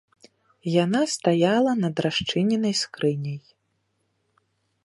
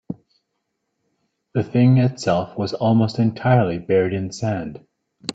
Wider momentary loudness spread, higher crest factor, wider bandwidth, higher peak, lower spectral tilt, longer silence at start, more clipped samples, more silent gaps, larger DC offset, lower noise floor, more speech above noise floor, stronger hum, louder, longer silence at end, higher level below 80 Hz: second, 11 LU vs 14 LU; about the same, 18 dB vs 18 dB; first, 11.5 kHz vs 8.4 kHz; second, -6 dBFS vs -2 dBFS; second, -5 dB/octave vs -7.5 dB/octave; first, 0.65 s vs 0.1 s; neither; neither; neither; about the same, -73 dBFS vs -75 dBFS; second, 50 dB vs 57 dB; neither; second, -23 LUFS vs -20 LUFS; first, 1.45 s vs 0 s; second, -62 dBFS vs -56 dBFS